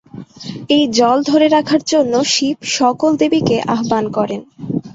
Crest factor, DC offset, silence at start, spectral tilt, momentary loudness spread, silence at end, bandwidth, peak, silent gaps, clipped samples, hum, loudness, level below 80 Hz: 14 dB; under 0.1%; 0.15 s; -4 dB/octave; 12 LU; 0 s; 7.8 kHz; 0 dBFS; none; under 0.1%; none; -15 LUFS; -54 dBFS